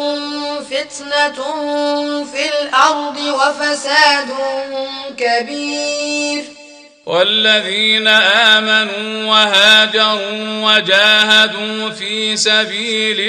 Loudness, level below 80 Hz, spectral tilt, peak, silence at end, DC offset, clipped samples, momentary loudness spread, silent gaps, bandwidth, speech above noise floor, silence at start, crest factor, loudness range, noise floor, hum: -13 LUFS; -62 dBFS; -1.5 dB/octave; 0 dBFS; 0 s; under 0.1%; under 0.1%; 13 LU; none; 16 kHz; 25 dB; 0 s; 14 dB; 7 LU; -40 dBFS; none